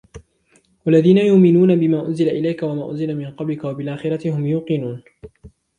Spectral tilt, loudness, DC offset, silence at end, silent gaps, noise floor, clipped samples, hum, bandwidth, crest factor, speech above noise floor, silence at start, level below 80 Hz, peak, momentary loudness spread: -9 dB/octave; -18 LUFS; under 0.1%; 0.3 s; none; -59 dBFS; under 0.1%; none; 9.8 kHz; 16 dB; 42 dB; 0.15 s; -54 dBFS; -2 dBFS; 13 LU